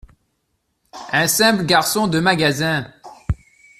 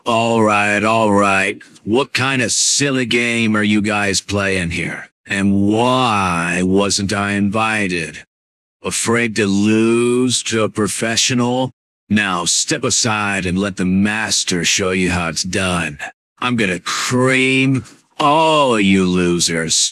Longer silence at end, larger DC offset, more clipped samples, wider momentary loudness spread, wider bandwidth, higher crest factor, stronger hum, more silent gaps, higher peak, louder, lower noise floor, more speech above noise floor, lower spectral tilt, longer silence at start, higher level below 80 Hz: first, 0.45 s vs 0 s; neither; neither; first, 17 LU vs 7 LU; first, 16 kHz vs 14.5 kHz; about the same, 18 dB vs 14 dB; neither; second, none vs 5.12-5.24 s, 8.27-8.80 s, 11.73-12.07 s, 16.14-16.36 s; about the same, -2 dBFS vs -4 dBFS; about the same, -17 LUFS vs -15 LUFS; second, -70 dBFS vs under -90 dBFS; second, 53 dB vs over 74 dB; about the same, -3.5 dB/octave vs -3.5 dB/octave; first, 0.95 s vs 0.05 s; about the same, -42 dBFS vs -42 dBFS